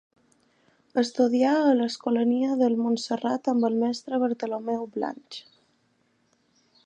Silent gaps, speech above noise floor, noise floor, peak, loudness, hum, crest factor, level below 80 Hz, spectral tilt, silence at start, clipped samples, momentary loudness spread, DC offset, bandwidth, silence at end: none; 44 dB; -68 dBFS; -10 dBFS; -25 LUFS; none; 16 dB; -80 dBFS; -5 dB/octave; 0.95 s; under 0.1%; 11 LU; under 0.1%; 9.2 kHz; 1.45 s